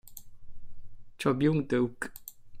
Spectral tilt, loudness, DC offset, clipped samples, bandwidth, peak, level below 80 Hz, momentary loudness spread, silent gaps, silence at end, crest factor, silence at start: -6.5 dB/octave; -30 LUFS; under 0.1%; under 0.1%; 16 kHz; -14 dBFS; -52 dBFS; 23 LU; none; 0 s; 18 dB; 0.05 s